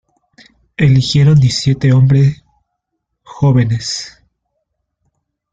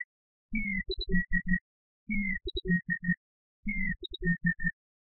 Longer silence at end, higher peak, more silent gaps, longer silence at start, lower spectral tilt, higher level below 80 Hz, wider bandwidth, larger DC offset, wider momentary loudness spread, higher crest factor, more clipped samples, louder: first, 1.45 s vs 0.3 s; first, -2 dBFS vs -14 dBFS; second, none vs 0.05-0.49 s, 1.61-2.06 s, 3.17-3.63 s; first, 0.8 s vs 0 s; about the same, -6.5 dB/octave vs -5.5 dB/octave; about the same, -42 dBFS vs -40 dBFS; first, 9 kHz vs 4.3 kHz; neither; first, 14 LU vs 6 LU; second, 12 dB vs 18 dB; neither; first, -12 LUFS vs -32 LUFS